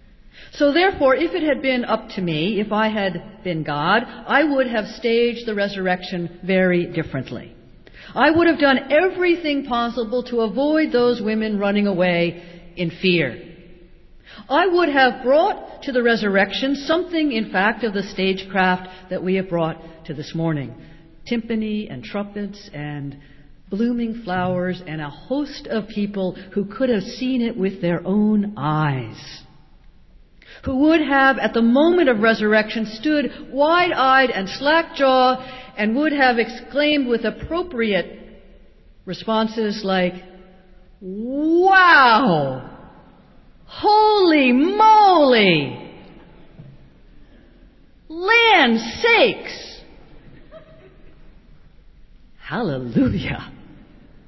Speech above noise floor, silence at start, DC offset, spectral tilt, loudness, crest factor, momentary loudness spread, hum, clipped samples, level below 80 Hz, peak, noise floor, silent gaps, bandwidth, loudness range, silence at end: 30 dB; 0.35 s; under 0.1%; -6.5 dB/octave; -18 LUFS; 18 dB; 15 LU; none; under 0.1%; -48 dBFS; 0 dBFS; -48 dBFS; none; 6.2 kHz; 10 LU; 0.5 s